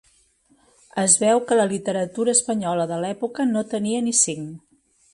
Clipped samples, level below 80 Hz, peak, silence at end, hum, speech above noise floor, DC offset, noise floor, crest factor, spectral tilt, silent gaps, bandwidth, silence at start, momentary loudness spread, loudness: under 0.1%; -66 dBFS; -2 dBFS; 0.55 s; none; 39 dB; under 0.1%; -60 dBFS; 20 dB; -3.5 dB/octave; none; 11.5 kHz; 0.95 s; 10 LU; -20 LUFS